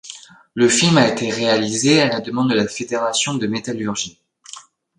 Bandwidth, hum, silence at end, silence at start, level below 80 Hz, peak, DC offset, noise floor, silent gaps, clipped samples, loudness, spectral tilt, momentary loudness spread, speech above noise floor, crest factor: 11.5 kHz; none; 0.35 s; 0.05 s; -58 dBFS; 0 dBFS; under 0.1%; -41 dBFS; none; under 0.1%; -17 LUFS; -4 dB/octave; 23 LU; 24 dB; 18 dB